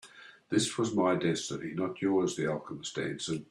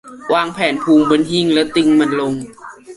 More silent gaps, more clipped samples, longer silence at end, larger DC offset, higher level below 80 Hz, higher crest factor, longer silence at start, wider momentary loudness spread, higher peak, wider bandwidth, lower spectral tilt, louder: neither; neither; about the same, 0.05 s vs 0 s; neither; second, -70 dBFS vs -54 dBFS; about the same, 16 dB vs 14 dB; about the same, 0.05 s vs 0.05 s; about the same, 8 LU vs 9 LU; second, -16 dBFS vs -2 dBFS; first, 13 kHz vs 11.5 kHz; about the same, -4.5 dB/octave vs -5 dB/octave; second, -32 LUFS vs -15 LUFS